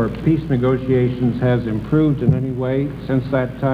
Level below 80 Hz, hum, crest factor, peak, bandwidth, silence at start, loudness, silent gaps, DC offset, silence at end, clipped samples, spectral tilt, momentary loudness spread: -38 dBFS; none; 16 dB; -2 dBFS; 5 kHz; 0 s; -19 LUFS; none; under 0.1%; 0 s; under 0.1%; -10 dB/octave; 4 LU